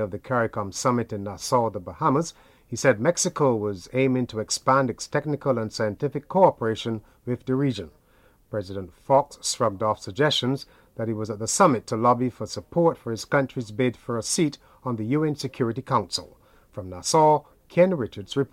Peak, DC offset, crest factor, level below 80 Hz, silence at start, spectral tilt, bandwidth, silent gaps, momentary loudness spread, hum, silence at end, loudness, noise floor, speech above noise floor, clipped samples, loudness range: -4 dBFS; under 0.1%; 20 dB; -58 dBFS; 0 s; -5 dB/octave; 16 kHz; none; 12 LU; none; 0.05 s; -24 LUFS; -59 dBFS; 34 dB; under 0.1%; 3 LU